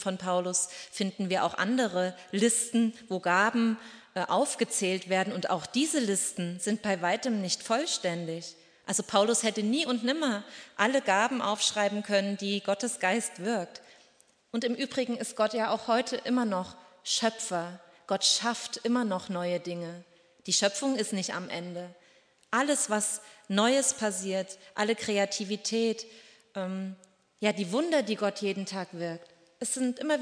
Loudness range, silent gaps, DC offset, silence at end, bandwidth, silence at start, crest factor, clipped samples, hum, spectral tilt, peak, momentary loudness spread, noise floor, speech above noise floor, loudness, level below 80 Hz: 4 LU; none; under 0.1%; 0 s; 11 kHz; 0 s; 22 dB; under 0.1%; none; -3 dB/octave; -8 dBFS; 12 LU; -64 dBFS; 34 dB; -29 LUFS; -78 dBFS